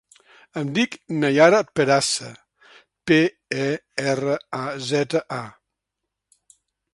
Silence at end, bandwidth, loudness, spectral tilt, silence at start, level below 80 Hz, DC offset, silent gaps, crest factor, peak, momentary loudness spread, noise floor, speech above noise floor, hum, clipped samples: 1.45 s; 11.5 kHz; -21 LUFS; -4.5 dB/octave; 0.55 s; -64 dBFS; under 0.1%; none; 22 dB; 0 dBFS; 16 LU; -82 dBFS; 62 dB; none; under 0.1%